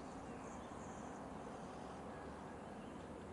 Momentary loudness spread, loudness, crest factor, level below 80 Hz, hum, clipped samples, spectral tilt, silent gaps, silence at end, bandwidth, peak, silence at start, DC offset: 1 LU; -51 LUFS; 14 dB; -66 dBFS; none; under 0.1%; -5.5 dB/octave; none; 0 s; 11.5 kHz; -36 dBFS; 0 s; under 0.1%